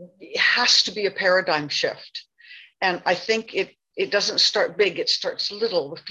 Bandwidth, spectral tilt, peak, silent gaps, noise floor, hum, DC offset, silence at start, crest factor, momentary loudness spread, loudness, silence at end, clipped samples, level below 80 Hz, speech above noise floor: 11.5 kHz; -1.5 dB/octave; -6 dBFS; none; -47 dBFS; none; under 0.1%; 0 s; 18 dB; 12 LU; -21 LUFS; 0 s; under 0.1%; -70 dBFS; 25 dB